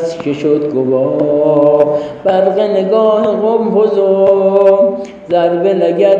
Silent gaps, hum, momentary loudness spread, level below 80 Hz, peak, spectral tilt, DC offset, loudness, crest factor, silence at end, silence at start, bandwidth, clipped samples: none; none; 5 LU; -56 dBFS; 0 dBFS; -8 dB/octave; under 0.1%; -11 LUFS; 10 dB; 0 s; 0 s; 7.6 kHz; under 0.1%